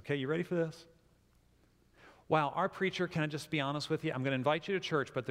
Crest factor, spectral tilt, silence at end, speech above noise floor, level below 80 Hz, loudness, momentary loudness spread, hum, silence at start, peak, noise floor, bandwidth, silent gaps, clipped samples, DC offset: 20 dB; -6 dB/octave; 0 s; 34 dB; -70 dBFS; -34 LUFS; 4 LU; none; 0.05 s; -16 dBFS; -68 dBFS; 15.5 kHz; none; under 0.1%; under 0.1%